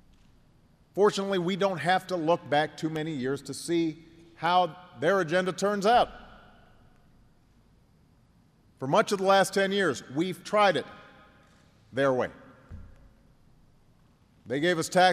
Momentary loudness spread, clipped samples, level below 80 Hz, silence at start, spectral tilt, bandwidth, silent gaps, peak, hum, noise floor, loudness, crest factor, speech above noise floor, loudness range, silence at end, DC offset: 10 LU; under 0.1%; -60 dBFS; 0.95 s; -4.5 dB/octave; 15.5 kHz; none; -8 dBFS; none; -62 dBFS; -27 LUFS; 20 dB; 36 dB; 7 LU; 0 s; under 0.1%